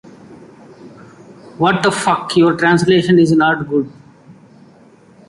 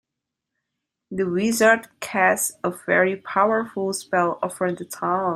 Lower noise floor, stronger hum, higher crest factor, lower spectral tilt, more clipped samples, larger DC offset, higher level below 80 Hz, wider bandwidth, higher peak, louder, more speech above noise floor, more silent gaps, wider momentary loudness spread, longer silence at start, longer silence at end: second, -45 dBFS vs -84 dBFS; neither; about the same, 16 dB vs 20 dB; first, -5.5 dB/octave vs -4 dB/octave; neither; neither; first, -52 dBFS vs -66 dBFS; second, 11.5 kHz vs 16 kHz; about the same, -2 dBFS vs -4 dBFS; first, -13 LUFS vs -22 LUFS; second, 33 dB vs 62 dB; neither; about the same, 7 LU vs 9 LU; second, 0.3 s vs 1.1 s; first, 0.95 s vs 0 s